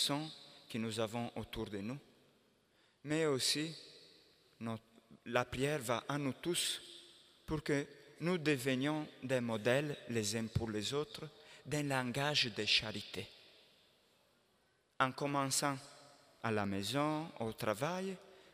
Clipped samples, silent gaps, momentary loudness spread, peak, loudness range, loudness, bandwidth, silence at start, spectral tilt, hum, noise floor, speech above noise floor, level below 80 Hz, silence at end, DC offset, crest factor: under 0.1%; none; 16 LU; -14 dBFS; 3 LU; -38 LUFS; 15.5 kHz; 0 s; -4 dB/octave; none; -75 dBFS; 37 dB; -68 dBFS; 0.1 s; under 0.1%; 24 dB